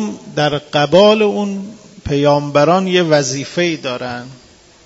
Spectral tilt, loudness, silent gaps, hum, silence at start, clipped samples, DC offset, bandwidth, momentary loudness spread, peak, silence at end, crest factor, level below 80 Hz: -5 dB/octave; -14 LUFS; none; none; 0 s; under 0.1%; under 0.1%; 8 kHz; 16 LU; 0 dBFS; 0.5 s; 16 dB; -48 dBFS